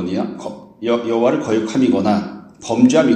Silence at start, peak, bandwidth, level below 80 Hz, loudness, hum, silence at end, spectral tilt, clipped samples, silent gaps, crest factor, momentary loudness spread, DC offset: 0 s; 0 dBFS; 9 kHz; -56 dBFS; -17 LUFS; none; 0 s; -6 dB/octave; under 0.1%; none; 16 dB; 17 LU; under 0.1%